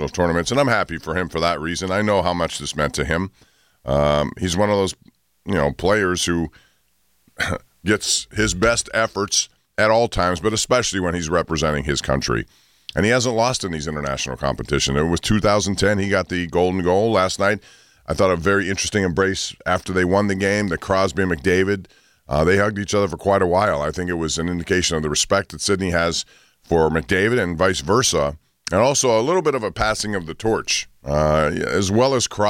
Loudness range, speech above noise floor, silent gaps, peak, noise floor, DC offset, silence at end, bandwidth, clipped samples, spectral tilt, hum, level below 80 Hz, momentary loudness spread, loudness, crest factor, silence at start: 3 LU; 45 dB; none; -6 dBFS; -65 dBFS; under 0.1%; 0 s; 16.5 kHz; under 0.1%; -4 dB/octave; none; -38 dBFS; 7 LU; -20 LUFS; 14 dB; 0 s